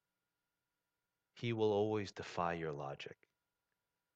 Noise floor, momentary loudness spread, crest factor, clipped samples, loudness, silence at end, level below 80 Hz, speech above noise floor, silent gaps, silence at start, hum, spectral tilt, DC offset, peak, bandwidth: under -90 dBFS; 13 LU; 20 dB; under 0.1%; -39 LUFS; 1 s; -74 dBFS; over 51 dB; none; 1.35 s; none; -6.5 dB/octave; under 0.1%; -24 dBFS; 8 kHz